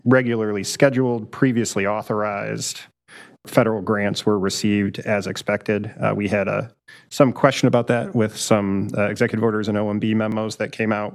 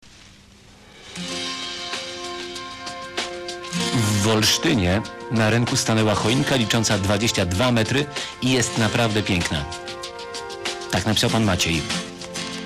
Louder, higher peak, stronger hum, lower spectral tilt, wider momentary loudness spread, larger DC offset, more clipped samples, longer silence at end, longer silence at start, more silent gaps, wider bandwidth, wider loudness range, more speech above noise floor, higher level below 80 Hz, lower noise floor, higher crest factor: about the same, -21 LUFS vs -22 LUFS; first, -2 dBFS vs -10 dBFS; neither; first, -5.5 dB/octave vs -4 dB/octave; second, 7 LU vs 12 LU; neither; neither; about the same, 0 s vs 0 s; about the same, 0.05 s vs 0.05 s; neither; about the same, 14.5 kHz vs 15.5 kHz; second, 3 LU vs 8 LU; about the same, 26 dB vs 28 dB; second, -60 dBFS vs -46 dBFS; about the same, -46 dBFS vs -48 dBFS; first, 20 dB vs 14 dB